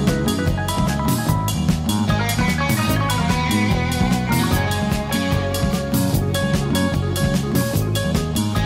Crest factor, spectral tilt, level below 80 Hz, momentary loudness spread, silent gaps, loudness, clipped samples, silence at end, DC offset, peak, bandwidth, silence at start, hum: 14 dB; -5.5 dB/octave; -30 dBFS; 2 LU; none; -20 LUFS; under 0.1%; 0 s; under 0.1%; -4 dBFS; 16.5 kHz; 0 s; none